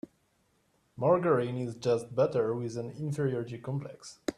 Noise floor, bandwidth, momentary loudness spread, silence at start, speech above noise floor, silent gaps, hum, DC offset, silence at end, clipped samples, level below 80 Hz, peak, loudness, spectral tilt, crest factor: -72 dBFS; 12 kHz; 11 LU; 0.95 s; 42 dB; none; none; under 0.1%; 0.05 s; under 0.1%; -68 dBFS; -12 dBFS; -31 LUFS; -7 dB/octave; 18 dB